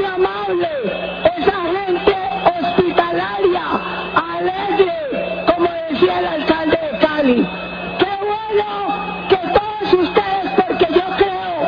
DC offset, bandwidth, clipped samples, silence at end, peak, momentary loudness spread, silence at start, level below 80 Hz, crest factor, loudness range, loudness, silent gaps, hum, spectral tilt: under 0.1%; 5.4 kHz; under 0.1%; 0 s; 0 dBFS; 6 LU; 0 s; -44 dBFS; 16 dB; 1 LU; -17 LUFS; none; none; -7.5 dB/octave